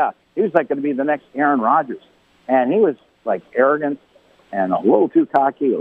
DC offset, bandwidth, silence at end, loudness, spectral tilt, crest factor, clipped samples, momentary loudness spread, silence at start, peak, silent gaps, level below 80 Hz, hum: under 0.1%; 4.6 kHz; 0 s; -18 LUFS; -9 dB/octave; 18 dB; under 0.1%; 13 LU; 0 s; 0 dBFS; none; -68 dBFS; none